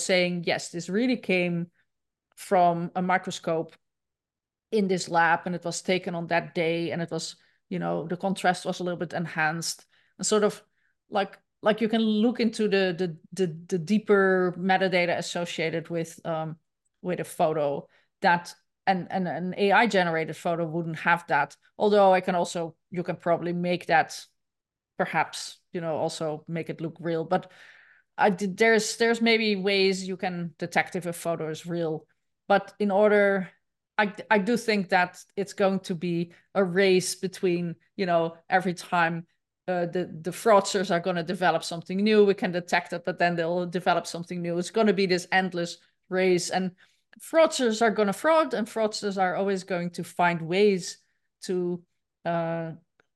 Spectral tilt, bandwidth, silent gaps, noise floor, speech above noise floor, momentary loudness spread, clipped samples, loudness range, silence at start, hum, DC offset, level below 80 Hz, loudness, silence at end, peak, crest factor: -5 dB/octave; 12.5 kHz; none; under -90 dBFS; over 64 dB; 11 LU; under 0.1%; 4 LU; 0 s; none; under 0.1%; -76 dBFS; -26 LUFS; 0.4 s; -6 dBFS; 20 dB